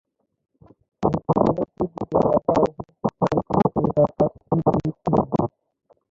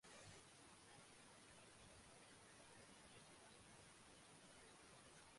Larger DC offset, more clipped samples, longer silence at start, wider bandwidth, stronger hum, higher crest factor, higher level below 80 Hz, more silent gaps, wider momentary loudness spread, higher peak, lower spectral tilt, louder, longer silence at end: neither; neither; first, 1 s vs 0.05 s; second, 7.6 kHz vs 11.5 kHz; neither; about the same, 20 dB vs 16 dB; first, -46 dBFS vs -82 dBFS; neither; first, 7 LU vs 2 LU; first, -4 dBFS vs -50 dBFS; first, -9.5 dB/octave vs -2.5 dB/octave; first, -22 LUFS vs -65 LUFS; first, 0.65 s vs 0 s